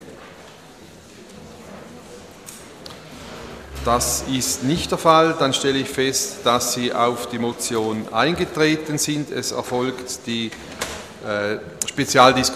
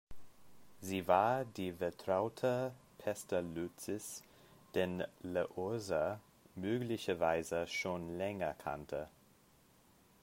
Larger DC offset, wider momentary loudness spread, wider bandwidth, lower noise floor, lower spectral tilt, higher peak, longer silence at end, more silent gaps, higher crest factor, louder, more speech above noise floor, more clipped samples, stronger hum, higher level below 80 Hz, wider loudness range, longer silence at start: neither; first, 24 LU vs 10 LU; about the same, 15 kHz vs 16 kHz; second, -43 dBFS vs -68 dBFS; second, -3.5 dB/octave vs -5 dB/octave; first, 0 dBFS vs -16 dBFS; second, 0 s vs 1.15 s; neither; about the same, 22 dB vs 24 dB; first, -20 LUFS vs -38 LUFS; second, 23 dB vs 30 dB; neither; neither; first, -46 dBFS vs -70 dBFS; first, 13 LU vs 4 LU; about the same, 0 s vs 0.1 s